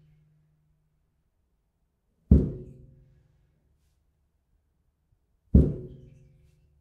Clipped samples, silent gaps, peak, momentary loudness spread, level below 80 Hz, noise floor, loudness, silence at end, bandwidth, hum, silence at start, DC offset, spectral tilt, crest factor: under 0.1%; none; -4 dBFS; 23 LU; -34 dBFS; -74 dBFS; -24 LUFS; 0.95 s; 1.7 kHz; none; 2.3 s; under 0.1%; -12.5 dB/octave; 26 dB